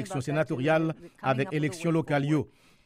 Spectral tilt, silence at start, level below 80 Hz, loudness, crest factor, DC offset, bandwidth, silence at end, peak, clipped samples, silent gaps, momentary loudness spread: -7 dB/octave; 0 s; -64 dBFS; -28 LUFS; 16 dB; under 0.1%; 14 kHz; 0.4 s; -12 dBFS; under 0.1%; none; 6 LU